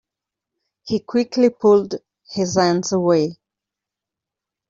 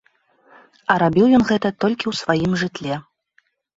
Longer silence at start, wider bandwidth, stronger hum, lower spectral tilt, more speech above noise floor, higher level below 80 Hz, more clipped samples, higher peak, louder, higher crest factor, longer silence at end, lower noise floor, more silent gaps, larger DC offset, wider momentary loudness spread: about the same, 0.85 s vs 0.9 s; about the same, 7.6 kHz vs 8 kHz; neither; about the same, -5.5 dB/octave vs -6 dB/octave; first, 69 dB vs 45 dB; second, -60 dBFS vs -52 dBFS; neither; about the same, -4 dBFS vs -2 dBFS; about the same, -18 LUFS vs -19 LUFS; about the same, 18 dB vs 18 dB; first, 1.35 s vs 0.75 s; first, -86 dBFS vs -63 dBFS; neither; neither; about the same, 12 LU vs 13 LU